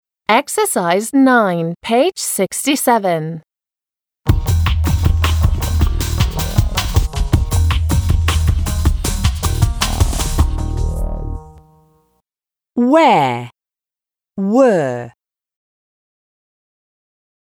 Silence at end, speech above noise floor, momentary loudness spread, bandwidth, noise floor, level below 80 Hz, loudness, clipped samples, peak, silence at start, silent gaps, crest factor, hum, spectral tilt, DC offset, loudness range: 2.5 s; over 76 dB; 11 LU; over 20 kHz; under -90 dBFS; -22 dBFS; -16 LUFS; under 0.1%; 0 dBFS; 0.3 s; none; 16 dB; none; -5.5 dB/octave; under 0.1%; 5 LU